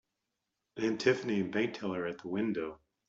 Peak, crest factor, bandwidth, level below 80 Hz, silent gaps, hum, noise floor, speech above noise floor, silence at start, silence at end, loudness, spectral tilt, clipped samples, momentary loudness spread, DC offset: -14 dBFS; 22 dB; 7.8 kHz; -72 dBFS; none; none; -86 dBFS; 53 dB; 0.75 s; 0.3 s; -34 LUFS; -6 dB/octave; under 0.1%; 9 LU; under 0.1%